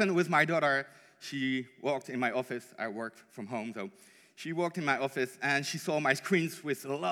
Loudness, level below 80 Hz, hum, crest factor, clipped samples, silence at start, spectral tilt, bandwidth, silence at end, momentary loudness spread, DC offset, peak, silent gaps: -32 LUFS; under -90 dBFS; none; 22 dB; under 0.1%; 0 s; -5 dB/octave; 17.5 kHz; 0 s; 15 LU; under 0.1%; -12 dBFS; none